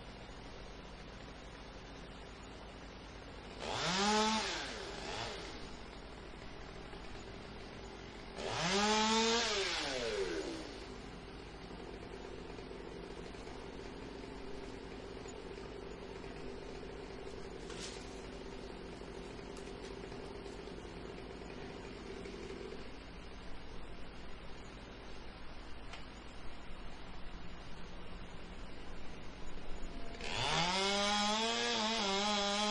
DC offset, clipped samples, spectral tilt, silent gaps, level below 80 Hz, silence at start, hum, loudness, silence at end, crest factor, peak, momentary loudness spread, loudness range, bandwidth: under 0.1%; under 0.1%; -3 dB/octave; none; -54 dBFS; 0 s; none; -39 LUFS; 0 s; 22 dB; -18 dBFS; 19 LU; 16 LU; 11.5 kHz